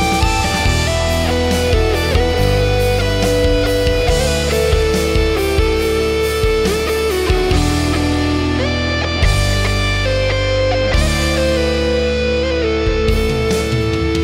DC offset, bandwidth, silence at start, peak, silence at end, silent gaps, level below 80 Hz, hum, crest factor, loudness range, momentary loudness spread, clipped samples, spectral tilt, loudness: under 0.1%; 16 kHz; 0 s; -2 dBFS; 0 s; none; -20 dBFS; none; 14 dB; 1 LU; 2 LU; under 0.1%; -5 dB/octave; -15 LUFS